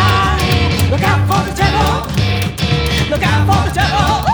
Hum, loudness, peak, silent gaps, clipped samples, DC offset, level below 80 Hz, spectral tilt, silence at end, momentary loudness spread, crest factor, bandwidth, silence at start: none; -14 LUFS; 0 dBFS; none; under 0.1%; under 0.1%; -24 dBFS; -5 dB/octave; 0 s; 3 LU; 12 dB; over 20 kHz; 0 s